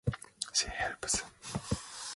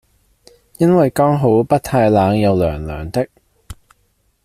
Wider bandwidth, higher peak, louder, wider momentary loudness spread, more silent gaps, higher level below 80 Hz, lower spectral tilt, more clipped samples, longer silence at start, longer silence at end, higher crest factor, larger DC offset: second, 11.5 kHz vs 15.5 kHz; second, -10 dBFS vs -2 dBFS; second, -35 LUFS vs -15 LUFS; about the same, 9 LU vs 9 LU; neither; second, -52 dBFS vs -40 dBFS; second, -2.5 dB/octave vs -7.5 dB/octave; neither; second, 0.05 s vs 0.8 s; second, 0 s vs 0.7 s; first, 26 dB vs 14 dB; neither